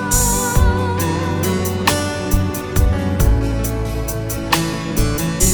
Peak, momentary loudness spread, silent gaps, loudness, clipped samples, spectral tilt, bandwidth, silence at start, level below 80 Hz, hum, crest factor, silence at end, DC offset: 0 dBFS; 6 LU; none; -18 LUFS; under 0.1%; -4.5 dB/octave; over 20 kHz; 0 s; -22 dBFS; none; 16 dB; 0 s; under 0.1%